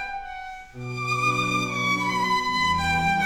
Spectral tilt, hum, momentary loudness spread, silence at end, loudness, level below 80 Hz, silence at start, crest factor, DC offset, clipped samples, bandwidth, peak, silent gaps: -4 dB/octave; none; 14 LU; 0 s; -23 LUFS; -48 dBFS; 0 s; 14 dB; under 0.1%; under 0.1%; 18.5 kHz; -10 dBFS; none